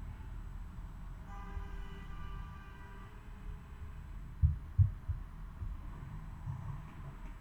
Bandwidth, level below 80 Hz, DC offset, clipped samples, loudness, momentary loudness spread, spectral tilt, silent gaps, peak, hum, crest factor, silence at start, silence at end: 8.2 kHz; -44 dBFS; under 0.1%; under 0.1%; -42 LUFS; 17 LU; -8 dB/octave; none; -16 dBFS; none; 24 dB; 0 s; 0 s